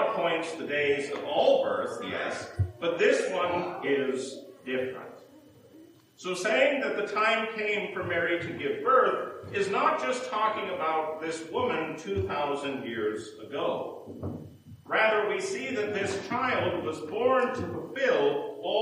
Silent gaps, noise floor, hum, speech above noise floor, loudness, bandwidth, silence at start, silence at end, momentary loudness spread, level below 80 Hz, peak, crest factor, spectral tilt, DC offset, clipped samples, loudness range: none; -54 dBFS; none; 26 dB; -28 LUFS; 15.5 kHz; 0 s; 0 s; 11 LU; -66 dBFS; -10 dBFS; 18 dB; -4.5 dB/octave; under 0.1%; under 0.1%; 5 LU